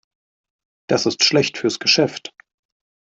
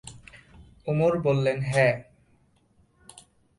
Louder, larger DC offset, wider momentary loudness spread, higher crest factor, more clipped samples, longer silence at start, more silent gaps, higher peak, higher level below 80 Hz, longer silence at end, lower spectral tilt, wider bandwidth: first, -17 LUFS vs -24 LUFS; neither; about the same, 12 LU vs 14 LU; about the same, 20 dB vs 20 dB; neither; first, 0.9 s vs 0.05 s; neither; first, -2 dBFS vs -8 dBFS; second, -64 dBFS vs -56 dBFS; second, 0.85 s vs 1.55 s; second, -3 dB/octave vs -6.5 dB/octave; second, 8.2 kHz vs 11.5 kHz